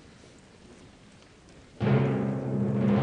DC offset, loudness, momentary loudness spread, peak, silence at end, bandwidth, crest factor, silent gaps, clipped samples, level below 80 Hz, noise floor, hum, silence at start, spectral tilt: under 0.1%; -27 LUFS; 5 LU; -12 dBFS; 0 s; 9 kHz; 16 dB; none; under 0.1%; -54 dBFS; -54 dBFS; none; 0.7 s; -9 dB/octave